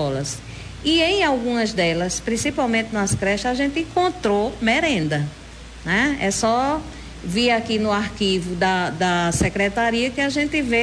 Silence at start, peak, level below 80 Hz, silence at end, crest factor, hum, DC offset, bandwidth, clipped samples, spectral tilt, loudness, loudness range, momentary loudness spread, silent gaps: 0 s; -6 dBFS; -40 dBFS; 0 s; 16 dB; none; under 0.1%; 11 kHz; under 0.1%; -4 dB/octave; -20 LUFS; 1 LU; 8 LU; none